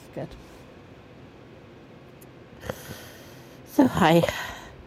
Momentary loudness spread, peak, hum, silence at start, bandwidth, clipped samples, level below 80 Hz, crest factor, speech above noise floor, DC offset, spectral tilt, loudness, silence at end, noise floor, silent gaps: 28 LU; -4 dBFS; none; 0.15 s; 16 kHz; under 0.1%; -52 dBFS; 24 dB; 26 dB; under 0.1%; -6 dB/octave; -24 LUFS; 0.15 s; -48 dBFS; none